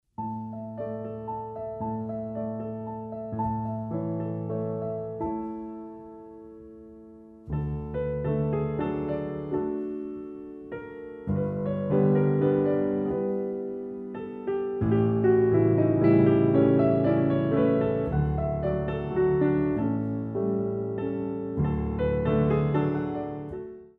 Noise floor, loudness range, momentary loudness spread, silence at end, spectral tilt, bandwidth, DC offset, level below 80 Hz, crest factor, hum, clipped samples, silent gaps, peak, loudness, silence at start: -48 dBFS; 11 LU; 16 LU; 0.1 s; -12 dB/octave; 4.3 kHz; under 0.1%; -46 dBFS; 18 dB; none; under 0.1%; none; -10 dBFS; -27 LUFS; 0.2 s